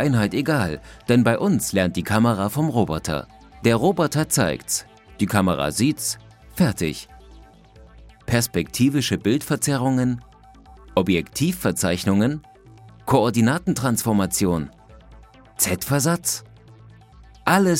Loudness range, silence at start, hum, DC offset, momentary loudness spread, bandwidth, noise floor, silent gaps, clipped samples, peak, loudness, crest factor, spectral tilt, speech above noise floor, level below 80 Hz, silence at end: 3 LU; 0 s; none; under 0.1%; 8 LU; 16.5 kHz; -48 dBFS; none; under 0.1%; -2 dBFS; -21 LUFS; 20 dB; -5 dB/octave; 27 dB; -48 dBFS; 0 s